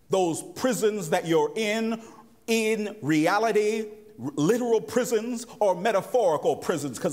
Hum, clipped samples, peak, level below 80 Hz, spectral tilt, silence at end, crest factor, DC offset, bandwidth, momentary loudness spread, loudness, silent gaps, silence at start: none; under 0.1%; -10 dBFS; -70 dBFS; -4.5 dB/octave; 0 s; 16 dB; under 0.1%; 16 kHz; 9 LU; -25 LUFS; none; 0.1 s